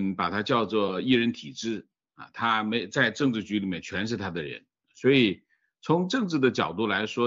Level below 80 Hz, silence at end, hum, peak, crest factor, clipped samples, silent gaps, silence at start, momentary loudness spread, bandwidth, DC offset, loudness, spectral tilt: -66 dBFS; 0 s; none; -8 dBFS; 18 dB; under 0.1%; none; 0 s; 12 LU; 7.8 kHz; under 0.1%; -26 LUFS; -5.5 dB/octave